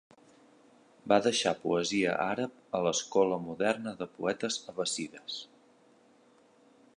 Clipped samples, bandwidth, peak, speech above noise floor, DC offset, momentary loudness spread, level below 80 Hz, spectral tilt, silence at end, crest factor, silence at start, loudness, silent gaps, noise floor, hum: under 0.1%; 11 kHz; -10 dBFS; 32 dB; under 0.1%; 12 LU; -72 dBFS; -3.5 dB/octave; 1.5 s; 24 dB; 1.05 s; -31 LUFS; none; -63 dBFS; none